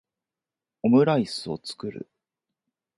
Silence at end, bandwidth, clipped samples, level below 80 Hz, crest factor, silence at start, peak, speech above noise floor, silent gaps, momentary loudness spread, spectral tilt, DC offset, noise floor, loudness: 0.95 s; 11.5 kHz; under 0.1%; -66 dBFS; 20 dB; 0.85 s; -8 dBFS; 66 dB; none; 16 LU; -6.5 dB/octave; under 0.1%; -90 dBFS; -24 LUFS